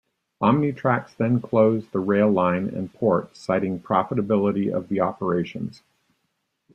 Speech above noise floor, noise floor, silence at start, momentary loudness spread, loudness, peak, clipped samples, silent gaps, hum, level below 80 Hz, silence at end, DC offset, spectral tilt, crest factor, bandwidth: 53 dB; -75 dBFS; 0.4 s; 6 LU; -23 LUFS; -4 dBFS; under 0.1%; none; none; -62 dBFS; 1.05 s; under 0.1%; -9 dB/octave; 18 dB; 8.6 kHz